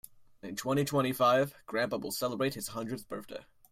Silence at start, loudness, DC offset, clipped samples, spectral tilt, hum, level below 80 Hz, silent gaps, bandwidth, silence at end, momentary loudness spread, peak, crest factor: 0.15 s; -32 LUFS; under 0.1%; under 0.1%; -5 dB/octave; none; -66 dBFS; none; 16 kHz; 0.3 s; 16 LU; -14 dBFS; 18 dB